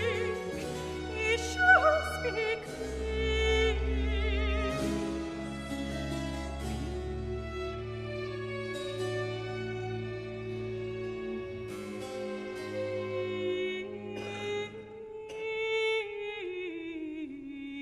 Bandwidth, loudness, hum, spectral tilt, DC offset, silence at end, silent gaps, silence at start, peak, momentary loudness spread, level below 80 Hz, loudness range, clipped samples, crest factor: 13.5 kHz; -33 LUFS; none; -5 dB/octave; under 0.1%; 0 s; none; 0 s; -10 dBFS; 11 LU; -40 dBFS; 9 LU; under 0.1%; 22 dB